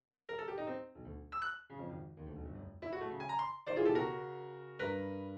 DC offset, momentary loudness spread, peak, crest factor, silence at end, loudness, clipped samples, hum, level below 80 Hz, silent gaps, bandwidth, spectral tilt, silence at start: under 0.1%; 15 LU; -20 dBFS; 20 dB; 0 s; -40 LUFS; under 0.1%; none; -60 dBFS; none; 8.4 kHz; -7.5 dB/octave; 0.3 s